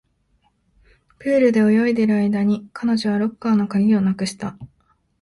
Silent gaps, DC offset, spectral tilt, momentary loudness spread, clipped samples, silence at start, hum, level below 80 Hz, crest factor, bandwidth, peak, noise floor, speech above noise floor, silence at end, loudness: none; under 0.1%; -7 dB/octave; 10 LU; under 0.1%; 1.2 s; none; -58 dBFS; 14 dB; 11.5 kHz; -6 dBFS; -64 dBFS; 46 dB; 0.55 s; -19 LUFS